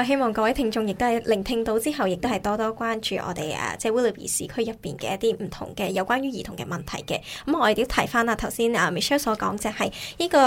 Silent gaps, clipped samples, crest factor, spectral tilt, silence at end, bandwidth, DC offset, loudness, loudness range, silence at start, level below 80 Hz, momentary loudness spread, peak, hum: none; under 0.1%; 22 dB; -4 dB/octave; 0 s; 16.5 kHz; under 0.1%; -25 LUFS; 3 LU; 0 s; -46 dBFS; 8 LU; -2 dBFS; none